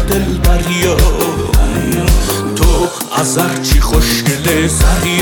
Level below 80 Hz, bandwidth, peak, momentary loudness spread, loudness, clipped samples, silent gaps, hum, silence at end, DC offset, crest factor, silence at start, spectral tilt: -14 dBFS; 19.5 kHz; 0 dBFS; 3 LU; -13 LUFS; under 0.1%; none; none; 0 s; under 0.1%; 12 dB; 0 s; -4.5 dB/octave